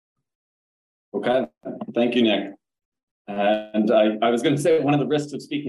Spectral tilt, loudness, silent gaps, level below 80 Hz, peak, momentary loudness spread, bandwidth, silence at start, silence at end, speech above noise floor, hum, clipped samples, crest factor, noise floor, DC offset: -6 dB/octave; -21 LUFS; 2.85-2.92 s, 3.03-3.25 s; -70 dBFS; -6 dBFS; 14 LU; 12.5 kHz; 1.15 s; 0 s; over 69 dB; none; under 0.1%; 16 dB; under -90 dBFS; under 0.1%